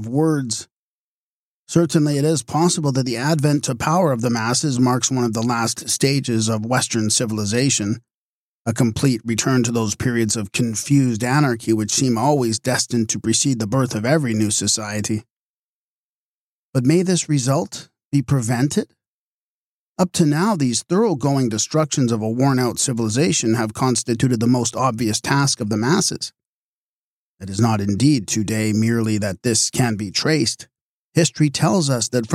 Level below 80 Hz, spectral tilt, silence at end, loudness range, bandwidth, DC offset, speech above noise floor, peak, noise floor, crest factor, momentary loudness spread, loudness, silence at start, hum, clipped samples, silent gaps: -54 dBFS; -4.5 dB/octave; 0 s; 3 LU; 15.5 kHz; under 0.1%; over 71 dB; -4 dBFS; under -90 dBFS; 16 dB; 4 LU; -19 LUFS; 0 s; none; under 0.1%; 0.72-1.67 s, 8.14-8.65 s, 15.30-16.73 s, 18.05-18.11 s, 19.08-19.95 s, 26.45-27.38 s, 30.81-31.12 s